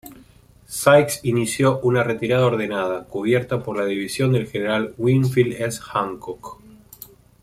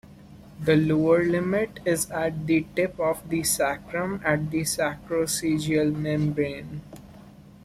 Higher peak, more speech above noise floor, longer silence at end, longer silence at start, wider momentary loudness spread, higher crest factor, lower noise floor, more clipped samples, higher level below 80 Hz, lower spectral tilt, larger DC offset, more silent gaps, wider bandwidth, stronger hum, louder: first, -2 dBFS vs -8 dBFS; first, 30 dB vs 23 dB; first, 0.9 s vs 0.25 s; about the same, 0.05 s vs 0.05 s; first, 16 LU vs 8 LU; about the same, 18 dB vs 18 dB; about the same, -50 dBFS vs -48 dBFS; neither; about the same, -54 dBFS vs -52 dBFS; about the same, -5.5 dB/octave vs -5 dB/octave; neither; neither; about the same, 16 kHz vs 15.5 kHz; neither; first, -20 LUFS vs -25 LUFS